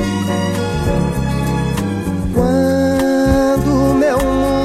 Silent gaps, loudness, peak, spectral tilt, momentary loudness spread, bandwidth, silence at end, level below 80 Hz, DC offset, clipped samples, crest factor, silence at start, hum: none; -15 LUFS; 0 dBFS; -6.5 dB/octave; 5 LU; 15.5 kHz; 0 s; -26 dBFS; under 0.1%; under 0.1%; 14 dB; 0 s; none